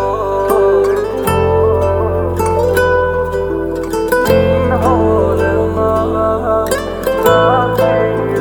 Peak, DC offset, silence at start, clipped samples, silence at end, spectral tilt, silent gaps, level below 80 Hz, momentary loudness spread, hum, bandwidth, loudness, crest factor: 0 dBFS; under 0.1%; 0 s; under 0.1%; 0 s; -6.5 dB/octave; none; -28 dBFS; 6 LU; none; over 20 kHz; -13 LUFS; 12 dB